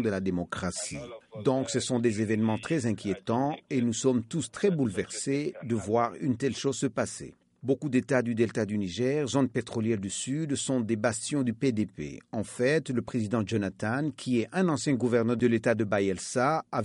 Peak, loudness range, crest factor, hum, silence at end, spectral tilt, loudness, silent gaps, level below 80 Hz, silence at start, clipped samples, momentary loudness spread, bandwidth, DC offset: -12 dBFS; 2 LU; 18 dB; none; 0 s; -5.5 dB/octave; -29 LUFS; none; -62 dBFS; 0 s; under 0.1%; 7 LU; 11.5 kHz; under 0.1%